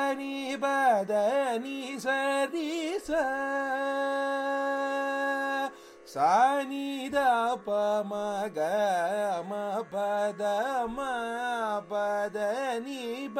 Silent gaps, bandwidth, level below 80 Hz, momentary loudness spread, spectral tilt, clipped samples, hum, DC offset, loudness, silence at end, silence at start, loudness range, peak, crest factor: none; 16 kHz; -66 dBFS; 8 LU; -4 dB/octave; under 0.1%; none; under 0.1%; -29 LUFS; 0 s; 0 s; 3 LU; -12 dBFS; 16 dB